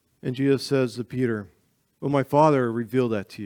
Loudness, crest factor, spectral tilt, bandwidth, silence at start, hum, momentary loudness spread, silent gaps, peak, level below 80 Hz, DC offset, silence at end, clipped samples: -24 LUFS; 20 dB; -7 dB/octave; 18 kHz; 0.25 s; none; 10 LU; none; -4 dBFS; -68 dBFS; under 0.1%; 0 s; under 0.1%